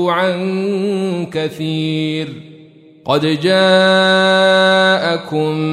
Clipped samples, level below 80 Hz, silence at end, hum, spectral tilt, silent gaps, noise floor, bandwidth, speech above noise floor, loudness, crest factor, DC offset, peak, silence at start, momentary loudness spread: under 0.1%; -62 dBFS; 0 s; none; -5.5 dB/octave; none; -42 dBFS; 13 kHz; 28 dB; -14 LUFS; 14 dB; under 0.1%; -2 dBFS; 0 s; 10 LU